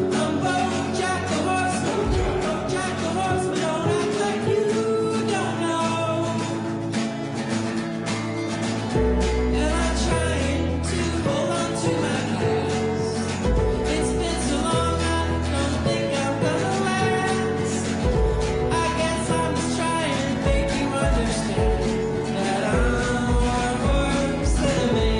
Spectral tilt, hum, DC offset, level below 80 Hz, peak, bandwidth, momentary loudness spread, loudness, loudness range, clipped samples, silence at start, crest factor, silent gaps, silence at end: -5 dB/octave; none; under 0.1%; -30 dBFS; -10 dBFS; 10.5 kHz; 3 LU; -23 LUFS; 2 LU; under 0.1%; 0 s; 12 dB; none; 0 s